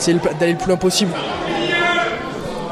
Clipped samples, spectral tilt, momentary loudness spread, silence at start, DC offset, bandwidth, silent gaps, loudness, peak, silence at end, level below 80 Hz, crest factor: under 0.1%; -4 dB/octave; 8 LU; 0 s; under 0.1%; 15 kHz; none; -18 LUFS; -4 dBFS; 0 s; -44 dBFS; 16 dB